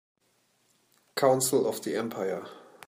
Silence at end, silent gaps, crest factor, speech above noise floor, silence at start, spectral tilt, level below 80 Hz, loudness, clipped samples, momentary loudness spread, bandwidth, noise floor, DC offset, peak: 0.25 s; none; 20 dB; 43 dB; 1.15 s; -4 dB/octave; -78 dBFS; -28 LUFS; under 0.1%; 14 LU; 15.5 kHz; -70 dBFS; under 0.1%; -10 dBFS